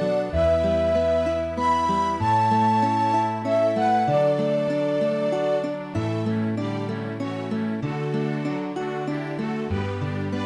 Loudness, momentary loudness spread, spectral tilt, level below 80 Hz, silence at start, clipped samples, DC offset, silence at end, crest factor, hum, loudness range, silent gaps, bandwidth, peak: -23 LUFS; 8 LU; -7.5 dB/octave; -44 dBFS; 0 s; under 0.1%; under 0.1%; 0 s; 12 dB; none; 6 LU; none; 11 kHz; -10 dBFS